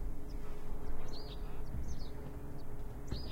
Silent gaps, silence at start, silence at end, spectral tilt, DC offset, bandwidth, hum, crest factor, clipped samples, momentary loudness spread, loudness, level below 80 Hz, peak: none; 0 s; 0 s; -6 dB/octave; under 0.1%; 6.8 kHz; none; 12 dB; under 0.1%; 4 LU; -47 LUFS; -42 dBFS; -24 dBFS